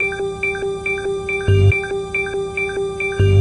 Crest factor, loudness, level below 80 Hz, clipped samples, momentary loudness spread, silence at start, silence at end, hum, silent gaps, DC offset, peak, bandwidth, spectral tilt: 14 dB; -19 LUFS; -36 dBFS; under 0.1%; 7 LU; 0 s; 0 s; none; none; under 0.1%; -4 dBFS; 11 kHz; -6.5 dB/octave